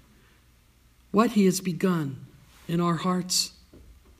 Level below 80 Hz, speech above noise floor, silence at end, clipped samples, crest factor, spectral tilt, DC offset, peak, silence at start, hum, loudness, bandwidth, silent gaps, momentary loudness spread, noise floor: -58 dBFS; 35 dB; 0.4 s; under 0.1%; 20 dB; -5 dB/octave; under 0.1%; -8 dBFS; 1.15 s; none; -25 LUFS; 15.5 kHz; none; 12 LU; -59 dBFS